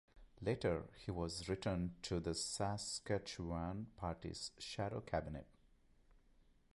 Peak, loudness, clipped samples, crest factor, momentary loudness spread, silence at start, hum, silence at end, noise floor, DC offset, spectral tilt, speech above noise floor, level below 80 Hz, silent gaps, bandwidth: -24 dBFS; -43 LUFS; under 0.1%; 20 dB; 6 LU; 0.15 s; none; 0.35 s; -70 dBFS; under 0.1%; -5 dB/octave; 27 dB; -58 dBFS; none; 11.5 kHz